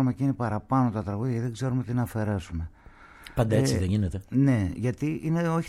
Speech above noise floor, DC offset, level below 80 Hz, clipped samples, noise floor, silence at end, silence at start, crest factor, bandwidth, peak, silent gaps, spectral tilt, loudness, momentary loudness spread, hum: 24 dB; under 0.1%; -46 dBFS; under 0.1%; -50 dBFS; 0 s; 0 s; 16 dB; 14 kHz; -10 dBFS; none; -7.5 dB/octave; -27 LUFS; 8 LU; none